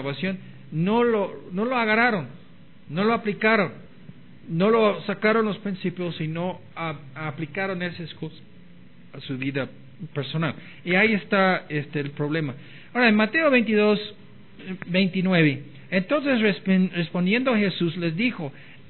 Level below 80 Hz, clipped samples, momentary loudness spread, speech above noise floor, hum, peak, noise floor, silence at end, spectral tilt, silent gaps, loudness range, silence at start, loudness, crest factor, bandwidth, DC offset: -68 dBFS; under 0.1%; 15 LU; 26 dB; none; -6 dBFS; -50 dBFS; 0.15 s; -10 dB/octave; none; 10 LU; 0 s; -23 LUFS; 18 dB; 4.4 kHz; 0.5%